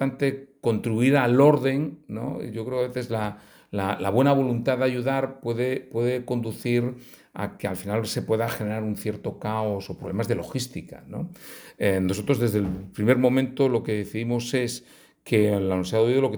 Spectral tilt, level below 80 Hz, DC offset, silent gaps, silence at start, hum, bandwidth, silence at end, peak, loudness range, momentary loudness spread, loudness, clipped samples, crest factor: -6.5 dB/octave; -60 dBFS; under 0.1%; none; 0 s; none; over 20 kHz; 0 s; -4 dBFS; 5 LU; 13 LU; -25 LUFS; under 0.1%; 20 dB